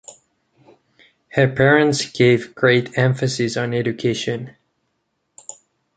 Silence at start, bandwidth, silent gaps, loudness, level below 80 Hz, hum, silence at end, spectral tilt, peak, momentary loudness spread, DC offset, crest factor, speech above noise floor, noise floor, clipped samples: 0.1 s; 9.4 kHz; none; -18 LUFS; -56 dBFS; none; 0.45 s; -5.5 dB/octave; -2 dBFS; 24 LU; under 0.1%; 18 dB; 54 dB; -72 dBFS; under 0.1%